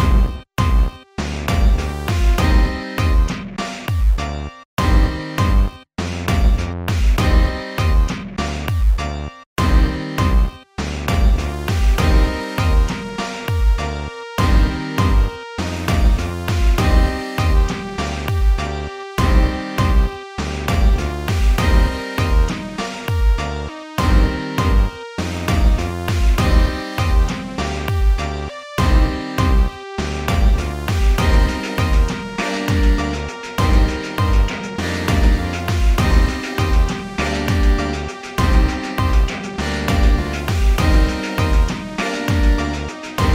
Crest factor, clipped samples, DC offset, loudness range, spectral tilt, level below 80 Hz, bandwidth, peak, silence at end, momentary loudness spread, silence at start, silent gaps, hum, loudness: 14 dB; under 0.1%; under 0.1%; 1 LU; -6 dB/octave; -18 dBFS; 15.5 kHz; -2 dBFS; 0 s; 8 LU; 0 s; 4.65-4.77 s, 9.46-9.56 s; none; -19 LUFS